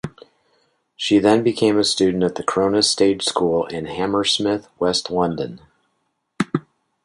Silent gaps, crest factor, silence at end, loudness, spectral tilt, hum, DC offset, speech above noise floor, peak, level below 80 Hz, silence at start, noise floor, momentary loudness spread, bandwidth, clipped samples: none; 18 dB; 0.45 s; -19 LUFS; -4 dB/octave; none; under 0.1%; 53 dB; -2 dBFS; -54 dBFS; 0.05 s; -71 dBFS; 11 LU; 11.5 kHz; under 0.1%